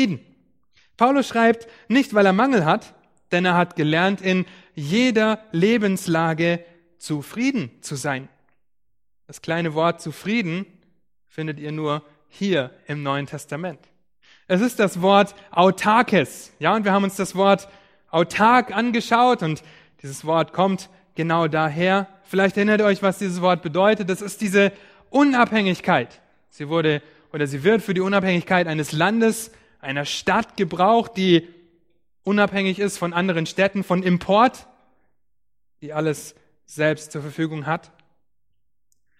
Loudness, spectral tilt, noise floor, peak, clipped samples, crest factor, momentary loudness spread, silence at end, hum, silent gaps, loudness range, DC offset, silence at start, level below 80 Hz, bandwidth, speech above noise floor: -21 LUFS; -5.5 dB/octave; -81 dBFS; 0 dBFS; under 0.1%; 20 dB; 13 LU; 1.4 s; none; none; 8 LU; under 0.1%; 0 s; -60 dBFS; 15.5 kHz; 60 dB